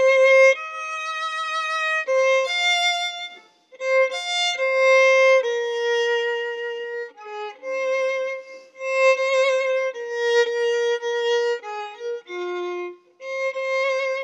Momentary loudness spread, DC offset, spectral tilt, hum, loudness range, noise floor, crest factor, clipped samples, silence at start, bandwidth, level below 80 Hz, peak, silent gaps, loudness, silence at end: 17 LU; under 0.1%; 1.5 dB/octave; none; 6 LU; -47 dBFS; 16 dB; under 0.1%; 0 s; 10 kHz; under -90 dBFS; -6 dBFS; none; -21 LUFS; 0 s